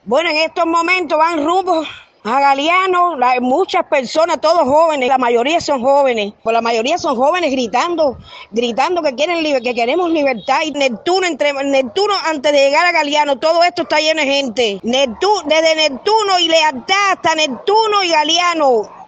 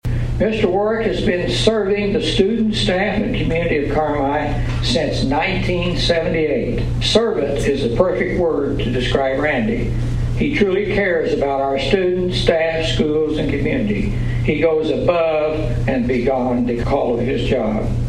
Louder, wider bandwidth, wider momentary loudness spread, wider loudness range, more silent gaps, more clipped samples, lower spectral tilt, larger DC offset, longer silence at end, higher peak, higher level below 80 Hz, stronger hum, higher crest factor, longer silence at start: first, -14 LUFS vs -18 LUFS; second, 8.8 kHz vs 11 kHz; about the same, 5 LU vs 4 LU; about the same, 3 LU vs 1 LU; neither; neither; second, -2.5 dB/octave vs -6 dB/octave; neither; about the same, 0.05 s vs 0 s; about the same, 0 dBFS vs 0 dBFS; second, -56 dBFS vs -28 dBFS; neither; about the same, 14 dB vs 18 dB; about the same, 0.05 s vs 0.05 s